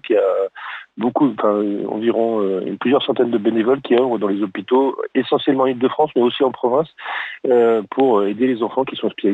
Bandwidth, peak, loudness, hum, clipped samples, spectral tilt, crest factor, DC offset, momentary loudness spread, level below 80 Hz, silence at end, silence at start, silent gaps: 4.3 kHz; -6 dBFS; -18 LUFS; none; under 0.1%; -8 dB/octave; 12 dB; under 0.1%; 7 LU; -68 dBFS; 0 s; 0.05 s; none